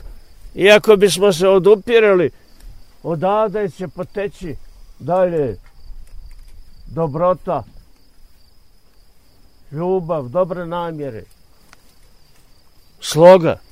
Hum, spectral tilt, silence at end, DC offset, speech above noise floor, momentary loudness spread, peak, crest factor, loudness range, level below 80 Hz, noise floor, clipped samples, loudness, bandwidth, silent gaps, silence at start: none; -5 dB/octave; 0.15 s; 0.4%; 35 dB; 21 LU; 0 dBFS; 18 dB; 11 LU; -42 dBFS; -50 dBFS; under 0.1%; -15 LUFS; 16 kHz; none; 0.05 s